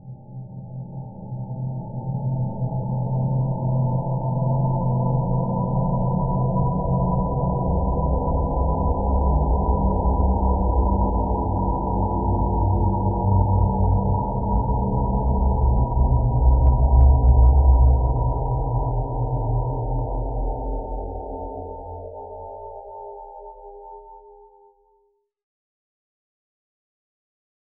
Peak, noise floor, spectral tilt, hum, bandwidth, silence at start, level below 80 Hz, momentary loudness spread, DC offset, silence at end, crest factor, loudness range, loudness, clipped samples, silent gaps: -4 dBFS; -66 dBFS; -5.5 dB/octave; none; 1.1 kHz; 0.05 s; -24 dBFS; 18 LU; under 0.1%; 3.45 s; 16 dB; 15 LU; -22 LUFS; under 0.1%; none